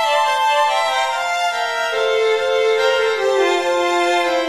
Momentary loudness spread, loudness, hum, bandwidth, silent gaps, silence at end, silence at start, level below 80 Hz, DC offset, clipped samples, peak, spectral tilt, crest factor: 3 LU; -17 LUFS; none; 14 kHz; none; 0 s; 0 s; -60 dBFS; 0.2%; under 0.1%; -6 dBFS; -1 dB/octave; 12 dB